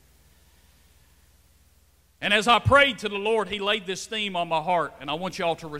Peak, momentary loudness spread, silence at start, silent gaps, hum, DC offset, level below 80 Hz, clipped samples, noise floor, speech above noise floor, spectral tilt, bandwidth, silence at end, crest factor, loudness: -4 dBFS; 12 LU; 2.2 s; none; none; under 0.1%; -50 dBFS; under 0.1%; -61 dBFS; 37 dB; -4 dB/octave; 16 kHz; 0 s; 22 dB; -23 LUFS